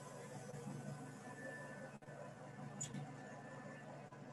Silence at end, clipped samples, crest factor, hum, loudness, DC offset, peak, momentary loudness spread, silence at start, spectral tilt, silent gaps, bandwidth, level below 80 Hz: 0 s; under 0.1%; 18 dB; none; -52 LUFS; under 0.1%; -32 dBFS; 7 LU; 0 s; -5 dB/octave; none; 12 kHz; -82 dBFS